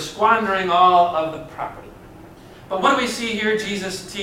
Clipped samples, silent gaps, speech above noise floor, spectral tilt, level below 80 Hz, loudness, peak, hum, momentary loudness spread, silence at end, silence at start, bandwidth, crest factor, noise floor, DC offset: under 0.1%; none; 23 dB; -3.5 dB/octave; -52 dBFS; -19 LUFS; -2 dBFS; none; 17 LU; 0 s; 0 s; 16 kHz; 18 dB; -42 dBFS; under 0.1%